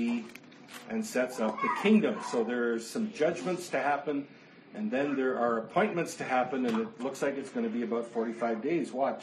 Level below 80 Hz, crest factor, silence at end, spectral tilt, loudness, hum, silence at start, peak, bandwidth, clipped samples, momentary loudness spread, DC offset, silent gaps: -80 dBFS; 18 dB; 0 s; -5.5 dB/octave; -31 LUFS; none; 0 s; -12 dBFS; 13 kHz; under 0.1%; 8 LU; under 0.1%; none